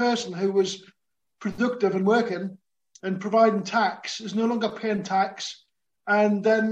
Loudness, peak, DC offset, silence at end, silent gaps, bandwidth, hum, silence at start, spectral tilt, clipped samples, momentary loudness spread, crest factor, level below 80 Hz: -25 LUFS; -6 dBFS; under 0.1%; 0 s; none; 8.8 kHz; none; 0 s; -5 dB/octave; under 0.1%; 14 LU; 18 dB; -68 dBFS